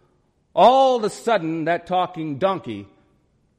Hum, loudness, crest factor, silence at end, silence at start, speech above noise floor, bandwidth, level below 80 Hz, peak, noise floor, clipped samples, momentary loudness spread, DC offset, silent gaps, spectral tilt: none; -20 LUFS; 18 dB; 0.75 s; 0.55 s; 44 dB; 14 kHz; -62 dBFS; -2 dBFS; -63 dBFS; under 0.1%; 14 LU; under 0.1%; none; -5.5 dB/octave